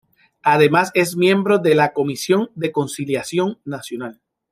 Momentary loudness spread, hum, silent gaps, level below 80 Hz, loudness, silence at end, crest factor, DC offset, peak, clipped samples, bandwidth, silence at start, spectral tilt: 14 LU; none; none; -64 dBFS; -18 LUFS; 0.4 s; 18 dB; under 0.1%; -2 dBFS; under 0.1%; 15.5 kHz; 0.45 s; -5.5 dB/octave